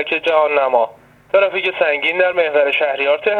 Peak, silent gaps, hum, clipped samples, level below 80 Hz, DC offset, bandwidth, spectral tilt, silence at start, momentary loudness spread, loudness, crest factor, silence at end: -2 dBFS; none; none; under 0.1%; -62 dBFS; under 0.1%; 6.2 kHz; -4 dB/octave; 0 s; 3 LU; -16 LUFS; 16 dB; 0 s